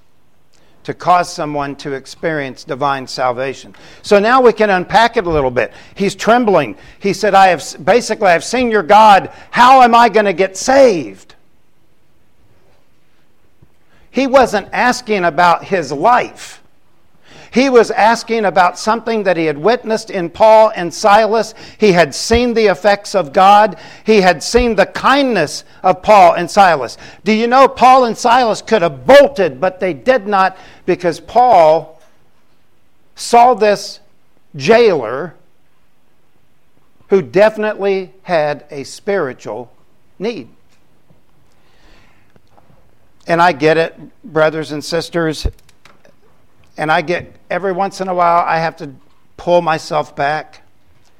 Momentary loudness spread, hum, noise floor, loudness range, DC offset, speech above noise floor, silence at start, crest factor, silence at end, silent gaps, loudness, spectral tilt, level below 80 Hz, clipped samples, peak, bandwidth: 15 LU; none; -59 dBFS; 9 LU; 0.7%; 47 dB; 0.9 s; 14 dB; 0.75 s; none; -12 LUFS; -4.5 dB/octave; -40 dBFS; under 0.1%; 0 dBFS; 16 kHz